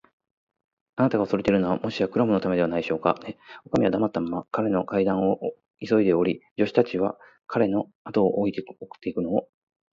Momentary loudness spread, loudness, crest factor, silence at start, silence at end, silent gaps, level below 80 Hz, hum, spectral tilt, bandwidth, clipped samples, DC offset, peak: 10 LU; -25 LUFS; 20 dB; 0.95 s; 0.5 s; 6.51-6.56 s, 7.95-8.05 s; -58 dBFS; none; -8 dB/octave; 7.4 kHz; under 0.1%; under 0.1%; -4 dBFS